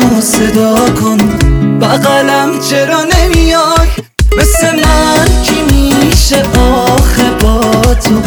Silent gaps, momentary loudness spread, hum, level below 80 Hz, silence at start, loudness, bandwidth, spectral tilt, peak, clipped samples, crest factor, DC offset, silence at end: none; 2 LU; none; -14 dBFS; 0 s; -8 LUFS; over 20 kHz; -4.5 dB/octave; 0 dBFS; 0.4%; 8 dB; under 0.1%; 0 s